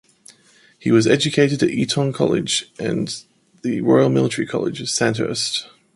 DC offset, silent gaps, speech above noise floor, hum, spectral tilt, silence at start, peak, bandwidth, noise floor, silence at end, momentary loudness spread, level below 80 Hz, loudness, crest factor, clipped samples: under 0.1%; none; 35 dB; none; -4.5 dB/octave; 0.3 s; -2 dBFS; 11.5 kHz; -53 dBFS; 0.3 s; 10 LU; -58 dBFS; -19 LUFS; 18 dB; under 0.1%